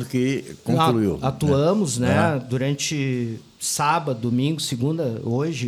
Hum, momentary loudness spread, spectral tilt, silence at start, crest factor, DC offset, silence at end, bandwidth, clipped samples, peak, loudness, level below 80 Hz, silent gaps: none; 6 LU; -5.5 dB/octave; 0 s; 16 dB; under 0.1%; 0 s; 16 kHz; under 0.1%; -6 dBFS; -22 LUFS; -52 dBFS; none